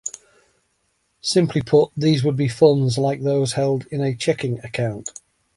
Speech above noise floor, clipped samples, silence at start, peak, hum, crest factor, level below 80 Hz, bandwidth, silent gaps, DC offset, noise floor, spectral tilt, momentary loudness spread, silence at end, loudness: 49 dB; under 0.1%; 0.05 s; -2 dBFS; none; 18 dB; -54 dBFS; 11.5 kHz; none; under 0.1%; -68 dBFS; -6 dB/octave; 10 LU; 0.45 s; -20 LUFS